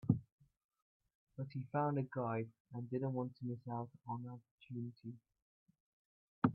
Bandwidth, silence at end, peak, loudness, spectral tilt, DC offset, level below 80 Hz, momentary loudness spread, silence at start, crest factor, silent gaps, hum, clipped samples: 4.8 kHz; 0 s; -16 dBFS; -43 LUFS; -9 dB/octave; under 0.1%; -76 dBFS; 15 LU; 0.05 s; 26 dB; 0.32-0.38 s, 0.64-0.69 s, 0.82-1.00 s, 1.15-1.27 s, 2.60-2.65 s, 4.51-4.58 s, 5.42-5.66 s, 5.80-6.42 s; none; under 0.1%